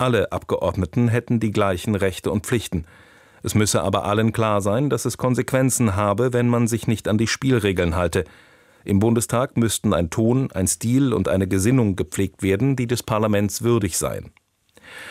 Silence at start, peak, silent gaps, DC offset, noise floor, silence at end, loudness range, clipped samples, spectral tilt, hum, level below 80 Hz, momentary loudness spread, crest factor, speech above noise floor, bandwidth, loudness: 0 s; -6 dBFS; none; under 0.1%; -54 dBFS; 0 s; 2 LU; under 0.1%; -5.5 dB/octave; none; -48 dBFS; 5 LU; 16 dB; 33 dB; 16 kHz; -21 LUFS